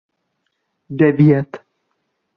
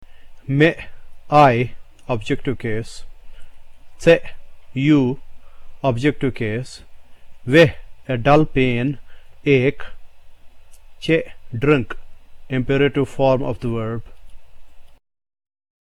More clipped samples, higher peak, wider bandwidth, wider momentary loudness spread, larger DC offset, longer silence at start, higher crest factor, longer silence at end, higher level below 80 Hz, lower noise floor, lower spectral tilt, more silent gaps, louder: neither; about the same, -2 dBFS vs -2 dBFS; second, 4.9 kHz vs 12 kHz; about the same, 20 LU vs 19 LU; neither; first, 0.9 s vs 0 s; about the same, 16 dB vs 18 dB; second, 0.8 s vs 0.95 s; second, -58 dBFS vs -38 dBFS; first, -71 dBFS vs -38 dBFS; first, -11 dB/octave vs -7 dB/octave; neither; first, -14 LUFS vs -19 LUFS